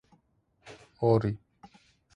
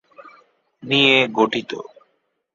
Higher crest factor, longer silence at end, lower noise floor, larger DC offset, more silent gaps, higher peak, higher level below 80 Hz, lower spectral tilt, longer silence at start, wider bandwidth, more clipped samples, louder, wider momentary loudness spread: about the same, 22 dB vs 20 dB; about the same, 0.8 s vs 0.7 s; about the same, -70 dBFS vs -69 dBFS; neither; neither; second, -12 dBFS vs 0 dBFS; first, -58 dBFS vs -64 dBFS; first, -9 dB/octave vs -4.5 dB/octave; first, 0.65 s vs 0.2 s; first, 8.6 kHz vs 7.6 kHz; neither; second, -28 LUFS vs -17 LUFS; first, 26 LU vs 18 LU